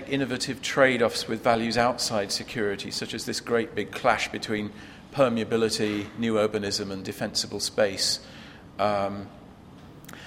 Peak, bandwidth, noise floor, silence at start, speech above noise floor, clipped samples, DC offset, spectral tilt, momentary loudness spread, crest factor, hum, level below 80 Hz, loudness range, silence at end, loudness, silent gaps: -4 dBFS; 16 kHz; -47 dBFS; 0 s; 21 dB; under 0.1%; under 0.1%; -3.5 dB/octave; 12 LU; 22 dB; none; -56 dBFS; 3 LU; 0 s; -26 LUFS; none